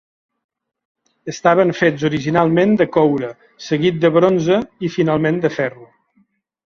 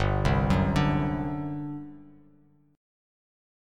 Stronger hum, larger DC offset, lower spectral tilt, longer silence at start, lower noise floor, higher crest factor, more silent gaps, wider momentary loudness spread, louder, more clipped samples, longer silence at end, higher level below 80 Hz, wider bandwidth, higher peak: second, none vs 50 Hz at -55 dBFS; neither; about the same, -6.5 dB/octave vs -7.5 dB/octave; first, 1.25 s vs 0 s; about the same, -61 dBFS vs -60 dBFS; about the same, 16 dB vs 18 dB; neither; second, 10 LU vs 14 LU; first, -16 LUFS vs -27 LUFS; neither; second, 0.9 s vs 1.65 s; second, -56 dBFS vs -38 dBFS; second, 7.2 kHz vs 10.5 kHz; first, -2 dBFS vs -10 dBFS